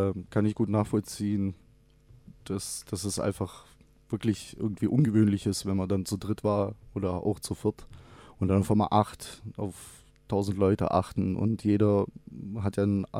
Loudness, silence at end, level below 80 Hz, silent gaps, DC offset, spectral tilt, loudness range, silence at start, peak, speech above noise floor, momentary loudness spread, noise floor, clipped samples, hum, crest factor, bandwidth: -29 LUFS; 0 s; -54 dBFS; none; under 0.1%; -7 dB/octave; 5 LU; 0 s; -8 dBFS; 30 dB; 13 LU; -58 dBFS; under 0.1%; none; 20 dB; 15.5 kHz